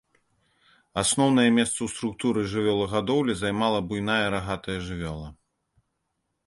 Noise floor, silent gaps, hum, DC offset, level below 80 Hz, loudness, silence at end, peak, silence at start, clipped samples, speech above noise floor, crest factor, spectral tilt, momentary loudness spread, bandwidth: -78 dBFS; none; none; under 0.1%; -50 dBFS; -25 LUFS; 1.15 s; -8 dBFS; 0.95 s; under 0.1%; 53 dB; 18 dB; -4.5 dB/octave; 13 LU; 11.5 kHz